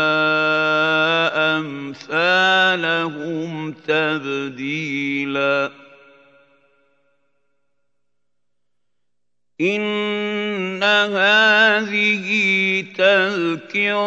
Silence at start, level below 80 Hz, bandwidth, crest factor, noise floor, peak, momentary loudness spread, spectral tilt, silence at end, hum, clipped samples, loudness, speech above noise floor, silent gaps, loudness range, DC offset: 0 s; -76 dBFS; 8.2 kHz; 18 dB; -83 dBFS; -2 dBFS; 11 LU; -4.5 dB/octave; 0 s; 60 Hz at -65 dBFS; under 0.1%; -18 LUFS; 62 dB; none; 11 LU; under 0.1%